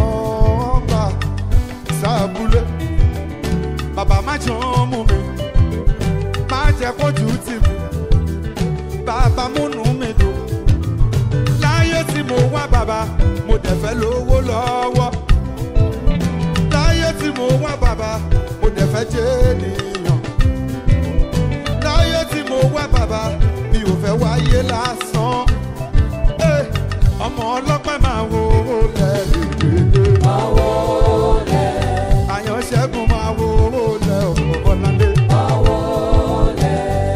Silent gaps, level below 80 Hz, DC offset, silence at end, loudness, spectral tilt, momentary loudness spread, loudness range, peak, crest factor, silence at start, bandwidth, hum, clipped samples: none; -20 dBFS; under 0.1%; 0 s; -17 LUFS; -6.5 dB/octave; 5 LU; 3 LU; -2 dBFS; 14 dB; 0 s; 15 kHz; none; under 0.1%